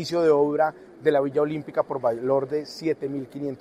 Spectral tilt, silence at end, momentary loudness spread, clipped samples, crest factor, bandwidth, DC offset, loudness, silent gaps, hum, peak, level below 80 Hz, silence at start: -6.5 dB/octave; 0.05 s; 9 LU; under 0.1%; 18 dB; 13.5 kHz; under 0.1%; -25 LUFS; none; none; -6 dBFS; -66 dBFS; 0 s